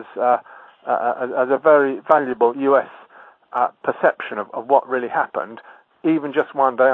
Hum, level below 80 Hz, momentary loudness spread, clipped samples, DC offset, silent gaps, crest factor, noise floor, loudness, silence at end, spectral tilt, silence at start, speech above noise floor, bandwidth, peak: none; -76 dBFS; 12 LU; under 0.1%; under 0.1%; none; 20 dB; -47 dBFS; -19 LUFS; 0 s; -8 dB/octave; 0 s; 28 dB; 4.1 kHz; 0 dBFS